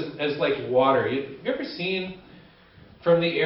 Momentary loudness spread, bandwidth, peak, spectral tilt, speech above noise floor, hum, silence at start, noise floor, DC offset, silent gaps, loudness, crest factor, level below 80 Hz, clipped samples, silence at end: 9 LU; 5.8 kHz; -8 dBFS; -10 dB/octave; 27 dB; none; 0 s; -51 dBFS; under 0.1%; none; -25 LUFS; 18 dB; -62 dBFS; under 0.1%; 0 s